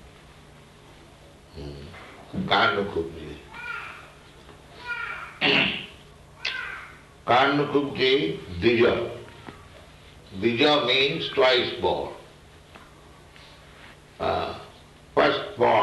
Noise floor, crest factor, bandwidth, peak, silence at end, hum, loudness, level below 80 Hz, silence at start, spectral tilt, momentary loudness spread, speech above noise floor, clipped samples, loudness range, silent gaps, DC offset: -50 dBFS; 22 dB; 12 kHz; -6 dBFS; 0 s; none; -24 LUFS; -54 dBFS; 0.05 s; -5.5 dB/octave; 21 LU; 27 dB; under 0.1%; 5 LU; none; under 0.1%